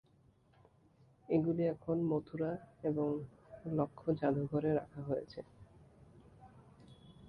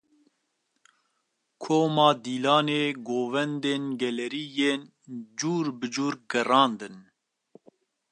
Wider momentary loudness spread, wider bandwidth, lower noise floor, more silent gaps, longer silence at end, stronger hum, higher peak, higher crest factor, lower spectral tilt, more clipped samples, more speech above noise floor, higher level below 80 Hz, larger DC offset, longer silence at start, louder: about the same, 12 LU vs 14 LU; second, 5.6 kHz vs 11 kHz; second, -69 dBFS vs -77 dBFS; neither; second, 0 s vs 1.1 s; neither; second, -20 dBFS vs -6 dBFS; about the same, 18 dB vs 22 dB; first, -10.5 dB/octave vs -4.5 dB/octave; neither; second, 33 dB vs 51 dB; first, -68 dBFS vs -80 dBFS; neither; second, 1.3 s vs 1.6 s; second, -37 LUFS vs -26 LUFS